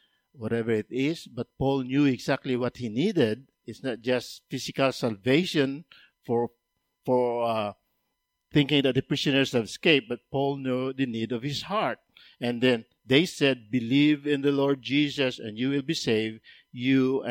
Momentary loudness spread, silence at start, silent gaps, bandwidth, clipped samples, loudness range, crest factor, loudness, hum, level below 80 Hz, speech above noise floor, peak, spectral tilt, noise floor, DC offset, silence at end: 11 LU; 0.4 s; none; 16 kHz; under 0.1%; 3 LU; 20 dB; -26 LUFS; none; -62 dBFS; 53 dB; -6 dBFS; -5.5 dB/octave; -79 dBFS; under 0.1%; 0 s